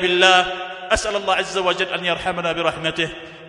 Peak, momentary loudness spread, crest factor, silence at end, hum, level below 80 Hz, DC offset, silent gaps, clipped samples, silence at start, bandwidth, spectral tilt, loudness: 0 dBFS; 11 LU; 20 dB; 0 s; none; -44 dBFS; under 0.1%; none; under 0.1%; 0 s; 11 kHz; -3 dB/octave; -19 LUFS